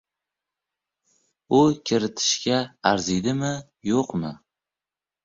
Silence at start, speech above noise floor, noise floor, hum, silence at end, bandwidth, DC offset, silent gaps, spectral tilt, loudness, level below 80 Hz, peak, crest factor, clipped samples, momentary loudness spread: 1.5 s; over 67 dB; under -90 dBFS; none; 0.9 s; 7.8 kHz; under 0.1%; none; -4.5 dB/octave; -23 LUFS; -56 dBFS; -4 dBFS; 22 dB; under 0.1%; 10 LU